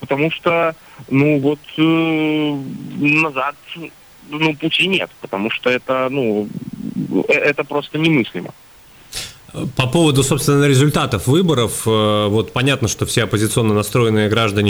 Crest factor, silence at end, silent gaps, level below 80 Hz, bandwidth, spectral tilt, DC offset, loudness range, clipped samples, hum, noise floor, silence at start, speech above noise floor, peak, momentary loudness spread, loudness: 14 dB; 0 s; none; -46 dBFS; over 20 kHz; -5 dB/octave; under 0.1%; 4 LU; under 0.1%; none; -42 dBFS; 0 s; 25 dB; -4 dBFS; 14 LU; -16 LUFS